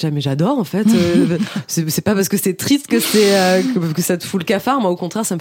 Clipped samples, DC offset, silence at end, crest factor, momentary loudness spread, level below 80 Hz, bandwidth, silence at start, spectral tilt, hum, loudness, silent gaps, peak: under 0.1%; under 0.1%; 0 s; 14 dB; 7 LU; -56 dBFS; 17 kHz; 0 s; -5 dB/octave; none; -16 LUFS; none; -2 dBFS